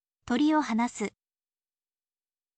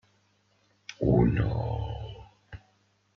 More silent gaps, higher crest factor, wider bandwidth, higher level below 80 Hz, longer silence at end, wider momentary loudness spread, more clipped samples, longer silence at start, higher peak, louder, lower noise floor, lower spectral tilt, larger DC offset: neither; about the same, 16 dB vs 20 dB; first, 9 kHz vs 6.6 kHz; second, -66 dBFS vs -42 dBFS; first, 1.5 s vs 0.6 s; second, 11 LU vs 26 LU; neither; second, 0.25 s vs 0.9 s; second, -16 dBFS vs -10 dBFS; about the same, -28 LUFS vs -28 LUFS; first, under -90 dBFS vs -68 dBFS; second, -4.5 dB/octave vs -8.5 dB/octave; neither